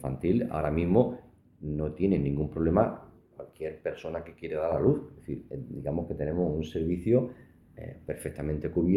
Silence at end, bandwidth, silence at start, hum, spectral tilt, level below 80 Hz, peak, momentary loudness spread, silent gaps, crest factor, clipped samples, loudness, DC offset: 0 s; 13 kHz; 0 s; none; -9 dB/octave; -46 dBFS; -8 dBFS; 14 LU; none; 22 dB; under 0.1%; -30 LUFS; under 0.1%